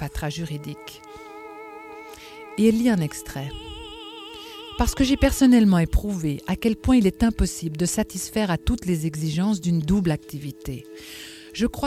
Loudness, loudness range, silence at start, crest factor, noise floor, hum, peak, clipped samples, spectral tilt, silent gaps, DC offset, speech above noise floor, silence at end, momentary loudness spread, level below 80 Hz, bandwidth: -23 LUFS; 6 LU; 0 s; 20 dB; -41 dBFS; none; -4 dBFS; under 0.1%; -5.5 dB/octave; none; under 0.1%; 19 dB; 0 s; 21 LU; -34 dBFS; 16 kHz